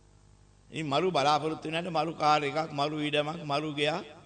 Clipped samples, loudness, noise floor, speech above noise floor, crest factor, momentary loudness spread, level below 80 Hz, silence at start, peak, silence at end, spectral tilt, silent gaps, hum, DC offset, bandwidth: under 0.1%; -29 LUFS; -59 dBFS; 29 dB; 20 dB; 6 LU; -66 dBFS; 0.7 s; -10 dBFS; 0.05 s; -5 dB/octave; none; 50 Hz at -55 dBFS; under 0.1%; 9.4 kHz